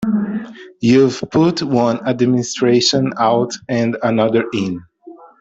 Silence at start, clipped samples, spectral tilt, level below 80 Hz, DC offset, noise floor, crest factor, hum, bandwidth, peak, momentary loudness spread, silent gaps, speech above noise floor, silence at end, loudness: 0 s; under 0.1%; -5.5 dB/octave; -54 dBFS; under 0.1%; -40 dBFS; 14 dB; none; 8 kHz; -2 dBFS; 9 LU; none; 25 dB; 0.25 s; -16 LUFS